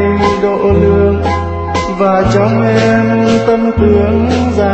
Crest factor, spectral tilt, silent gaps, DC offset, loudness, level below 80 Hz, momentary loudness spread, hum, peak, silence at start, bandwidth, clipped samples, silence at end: 10 dB; -7.5 dB/octave; none; under 0.1%; -11 LUFS; -26 dBFS; 5 LU; none; 0 dBFS; 0 s; 8.4 kHz; under 0.1%; 0 s